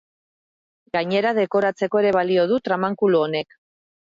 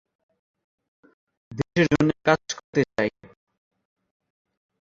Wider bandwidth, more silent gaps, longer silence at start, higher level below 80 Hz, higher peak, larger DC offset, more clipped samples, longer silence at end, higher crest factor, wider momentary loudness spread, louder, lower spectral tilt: about the same, 7.6 kHz vs 7.8 kHz; second, none vs 2.64-2.73 s; second, 0.95 s vs 1.5 s; second, -68 dBFS vs -56 dBFS; second, -8 dBFS vs -4 dBFS; neither; neither; second, 0.75 s vs 1.8 s; second, 14 dB vs 24 dB; about the same, 7 LU vs 9 LU; first, -21 LUFS vs -24 LUFS; first, -7 dB/octave vs -5.5 dB/octave